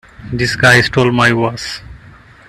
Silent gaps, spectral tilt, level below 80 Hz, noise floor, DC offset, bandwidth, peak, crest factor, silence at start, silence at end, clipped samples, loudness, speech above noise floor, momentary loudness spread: none; -5 dB/octave; -40 dBFS; -40 dBFS; under 0.1%; 13.5 kHz; 0 dBFS; 14 dB; 0.2 s; 0.5 s; under 0.1%; -11 LUFS; 28 dB; 16 LU